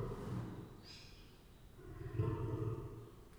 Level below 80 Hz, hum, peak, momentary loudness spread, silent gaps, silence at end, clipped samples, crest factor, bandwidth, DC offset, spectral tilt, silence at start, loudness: -56 dBFS; none; -26 dBFS; 20 LU; none; 0 s; under 0.1%; 18 dB; over 20 kHz; under 0.1%; -8 dB/octave; 0 s; -45 LUFS